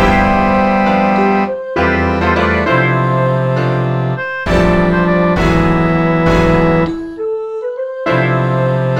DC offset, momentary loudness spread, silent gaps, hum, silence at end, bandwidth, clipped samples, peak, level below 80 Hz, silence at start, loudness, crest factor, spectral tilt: 0.3%; 8 LU; none; none; 0 s; 9.4 kHz; under 0.1%; 0 dBFS; -26 dBFS; 0 s; -13 LUFS; 12 dB; -7.5 dB/octave